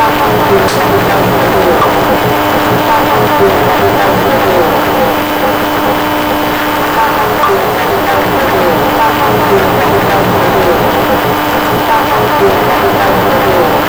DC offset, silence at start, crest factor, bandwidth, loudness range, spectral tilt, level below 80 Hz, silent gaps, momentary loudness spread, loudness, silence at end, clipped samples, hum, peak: under 0.1%; 0 s; 8 dB; over 20 kHz; 2 LU; -5 dB/octave; -32 dBFS; none; 2 LU; -9 LUFS; 0 s; under 0.1%; none; 0 dBFS